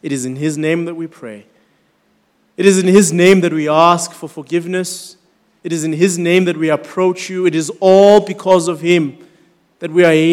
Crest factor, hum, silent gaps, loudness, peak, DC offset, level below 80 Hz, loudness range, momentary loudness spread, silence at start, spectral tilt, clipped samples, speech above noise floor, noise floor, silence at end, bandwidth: 14 dB; none; none; -13 LUFS; 0 dBFS; under 0.1%; -60 dBFS; 4 LU; 17 LU; 0.05 s; -5 dB/octave; 0.7%; 46 dB; -59 dBFS; 0 s; 16 kHz